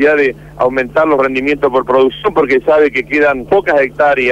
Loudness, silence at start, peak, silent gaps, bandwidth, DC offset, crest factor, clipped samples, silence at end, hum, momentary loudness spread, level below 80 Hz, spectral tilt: -12 LUFS; 0 s; -2 dBFS; none; 8.4 kHz; under 0.1%; 10 dB; under 0.1%; 0 s; none; 4 LU; -42 dBFS; -6.5 dB/octave